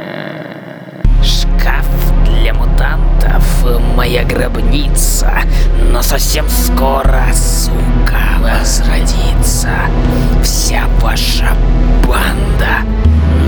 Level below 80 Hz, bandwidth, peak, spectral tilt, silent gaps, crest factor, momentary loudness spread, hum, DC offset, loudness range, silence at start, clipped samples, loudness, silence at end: -10 dBFS; over 20 kHz; 0 dBFS; -4.5 dB/octave; none; 10 dB; 3 LU; none; under 0.1%; 1 LU; 0 s; under 0.1%; -13 LUFS; 0 s